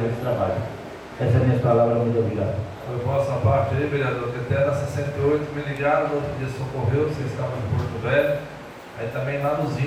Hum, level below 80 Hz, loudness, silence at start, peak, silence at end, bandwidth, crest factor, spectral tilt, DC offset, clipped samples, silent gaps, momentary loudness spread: none; -48 dBFS; -23 LUFS; 0 s; -6 dBFS; 0 s; 13 kHz; 16 dB; -8 dB/octave; under 0.1%; under 0.1%; none; 11 LU